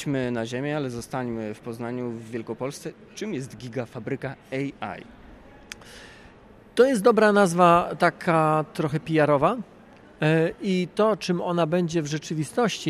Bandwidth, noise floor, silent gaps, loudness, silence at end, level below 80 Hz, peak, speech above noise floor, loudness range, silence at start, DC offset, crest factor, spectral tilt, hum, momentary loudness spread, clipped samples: 14.5 kHz; -50 dBFS; none; -24 LUFS; 0 s; -58 dBFS; -4 dBFS; 26 dB; 13 LU; 0 s; under 0.1%; 20 dB; -6 dB/octave; none; 17 LU; under 0.1%